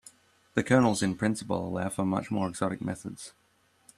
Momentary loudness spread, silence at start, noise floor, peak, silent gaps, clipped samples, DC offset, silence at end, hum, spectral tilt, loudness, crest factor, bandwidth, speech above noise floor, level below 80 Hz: 15 LU; 0.55 s; -62 dBFS; -8 dBFS; none; under 0.1%; under 0.1%; 0.7 s; none; -5.5 dB/octave; -29 LUFS; 22 dB; 13.5 kHz; 33 dB; -62 dBFS